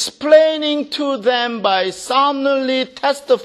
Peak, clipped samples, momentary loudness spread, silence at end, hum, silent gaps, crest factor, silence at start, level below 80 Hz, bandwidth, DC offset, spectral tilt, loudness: 0 dBFS; under 0.1%; 8 LU; 0 s; none; none; 16 dB; 0 s; -64 dBFS; 13.5 kHz; under 0.1%; -2.5 dB/octave; -16 LUFS